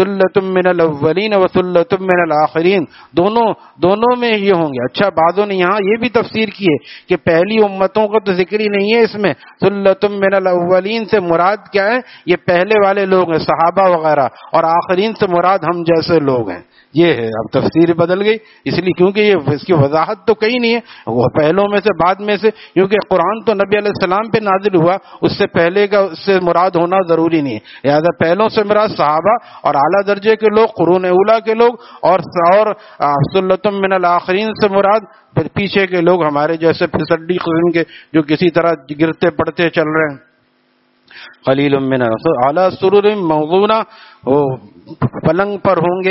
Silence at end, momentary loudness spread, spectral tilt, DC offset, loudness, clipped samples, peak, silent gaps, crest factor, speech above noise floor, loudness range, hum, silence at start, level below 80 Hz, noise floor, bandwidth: 0 s; 5 LU; -4.5 dB/octave; under 0.1%; -13 LUFS; under 0.1%; 0 dBFS; none; 14 dB; 44 dB; 2 LU; none; 0 s; -50 dBFS; -57 dBFS; 6 kHz